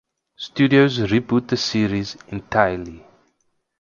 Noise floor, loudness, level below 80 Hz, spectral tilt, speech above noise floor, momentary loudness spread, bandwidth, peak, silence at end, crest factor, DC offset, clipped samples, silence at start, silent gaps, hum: -69 dBFS; -19 LUFS; -48 dBFS; -6 dB/octave; 49 dB; 16 LU; 7.4 kHz; 0 dBFS; 0.8 s; 20 dB; under 0.1%; under 0.1%; 0.4 s; none; none